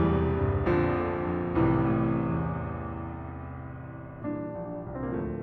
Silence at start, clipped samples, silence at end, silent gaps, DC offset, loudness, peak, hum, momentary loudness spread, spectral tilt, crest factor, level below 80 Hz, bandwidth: 0 s; under 0.1%; 0 s; none; under 0.1%; -29 LUFS; -14 dBFS; none; 14 LU; -11 dB/octave; 16 dB; -44 dBFS; 4.5 kHz